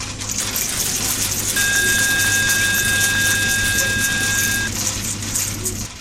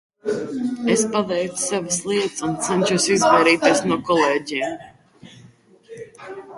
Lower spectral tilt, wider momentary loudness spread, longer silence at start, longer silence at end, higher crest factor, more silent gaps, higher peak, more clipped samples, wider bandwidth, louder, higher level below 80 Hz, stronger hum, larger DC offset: second, -1 dB/octave vs -3.5 dB/octave; second, 6 LU vs 20 LU; second, 0 s vs 0.25 s; about the same, 0 s vs 0 s; about the same, 16 dB vs 18 dB; neither; about the same, -2 dBFS vs -2 dBFS; neither; first, 16.5 kHz vs 11.5 kHz; first, -17 LUFS vs -20 LUFS; first, -38 dBFS vs -60 dBFS; neither; neither